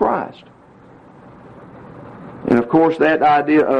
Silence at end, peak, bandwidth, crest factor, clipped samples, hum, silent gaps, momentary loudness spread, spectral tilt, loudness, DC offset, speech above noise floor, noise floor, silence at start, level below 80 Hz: 0 s; -2 dBFS; 6.2 kHz; 16 dB; under 0.1%; none; none; 24 LU; -8 dB/octave; -15 LUFS; under 0.1%; 30 dB; -45 dBFS; 0 s; -52 dBFS